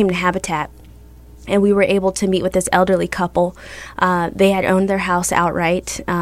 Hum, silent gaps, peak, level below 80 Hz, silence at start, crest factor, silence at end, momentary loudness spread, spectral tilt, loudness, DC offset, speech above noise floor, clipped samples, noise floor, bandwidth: none; none; 0 dBFS; -40 dBFS; 0 s; 16 dB; 0 s; 8 LU; -5 dB/octave; -17 LUFS; under 0.1%; 24 dB; under 0.1%; -41 dBFS; 15.5 kHz